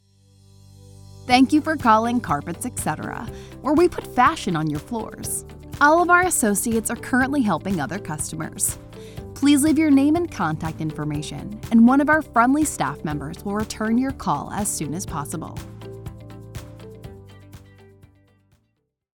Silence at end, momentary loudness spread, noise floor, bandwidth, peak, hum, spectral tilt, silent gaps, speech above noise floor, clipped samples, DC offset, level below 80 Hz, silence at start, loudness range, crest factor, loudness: 1.6 s; 21 LU; -72 dBFS; 19.5 kHz; -2 dBFS; 50 Hz at -50 dBFS; -4.5 dB/octave; none; 51 dB; under 0.1%; under 0.1%; -46 dBFS; 1.15 s; 10 LU; 20 dB; -21 LUFS